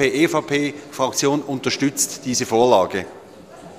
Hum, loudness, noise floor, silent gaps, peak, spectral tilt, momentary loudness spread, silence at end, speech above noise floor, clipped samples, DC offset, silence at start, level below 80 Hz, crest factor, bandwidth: none; -20 LUFS; -41 dBFS; none; -2 dBFS; -3.5 dB/octave; 9 LU; 0 s; 21 dB; under 0.1%; under 0.1%; 0 s; -58 dBFS; 20 dB; 15 kHz